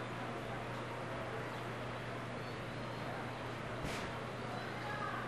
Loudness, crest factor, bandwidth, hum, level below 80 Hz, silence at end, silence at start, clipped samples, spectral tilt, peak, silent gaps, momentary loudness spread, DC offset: -43 LUFS; 16 dB; 13 kHz; none; -62 dBFS; 0 s; 0 s; under 0.1%; -5.5 dB/octave; -26 dBFS; none; 2 LU; under 0.1%